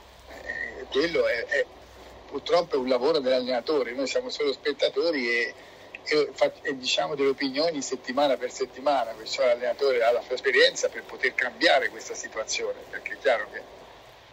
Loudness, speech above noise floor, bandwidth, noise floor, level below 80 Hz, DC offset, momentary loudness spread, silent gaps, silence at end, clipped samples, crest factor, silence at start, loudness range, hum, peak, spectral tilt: -26 LUFS; 23 dB; 16 kHz; -49 dBFS; -60 dBFS; under 0.1%; 12 LU; none; 0.2 s; under 0.1%; 22 dB; 0.2 s; 3 LU; none; -6 dBFS; -2 dB/octave